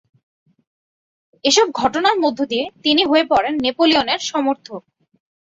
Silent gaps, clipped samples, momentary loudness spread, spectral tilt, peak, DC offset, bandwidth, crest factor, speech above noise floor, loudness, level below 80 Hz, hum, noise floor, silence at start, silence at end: none; under 0.1%; 8 LU; -2 dB/octave; -2 dBFS; under 0.1%; 8 kHz; 18 dB; over 73 dB; -17 LUFS; -56 dBFS; none; under -90 dBFS; 1.45 s; 0.65 s